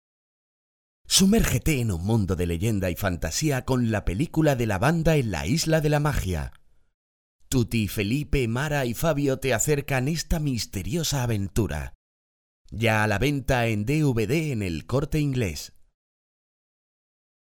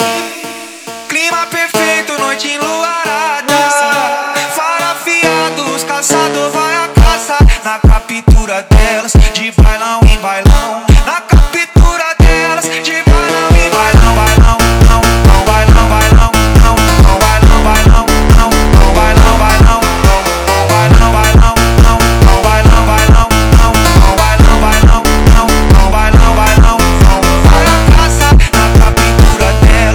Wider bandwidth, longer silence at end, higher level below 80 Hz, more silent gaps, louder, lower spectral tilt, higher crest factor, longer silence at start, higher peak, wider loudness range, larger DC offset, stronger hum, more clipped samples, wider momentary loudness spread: about the same, 18 kHz vs 19 kHz; first, 1.75 s vs 0 s; second, -38 dBFS vs -10 dBFS; first, 6.94-7.39 s, 11.95-12.65 s vs none; second, -25 LUFS vs -8 LUFS; about the same, -5 dB/octave vs -5 dB/octave; first, 18 dB vs 6 dB; first, 1.05 s vs 0 s; second, -6 dBFS vs 0 dBFS; about the same, 4 LU vs 4 LU; neither; neither; second, under 0.1% vs 3%; about the same, 6 LU vs 6 LU